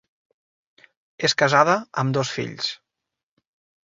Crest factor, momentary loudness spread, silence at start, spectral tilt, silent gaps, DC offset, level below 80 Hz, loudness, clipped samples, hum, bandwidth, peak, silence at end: 22 dB; 11 LU; 1.2 s; -4 dB/octave; none; under 0.1%; -64 dBFS; -21 LUFS; under 0.1%; none; 8 kHz; -2 dBFS; 1.1 s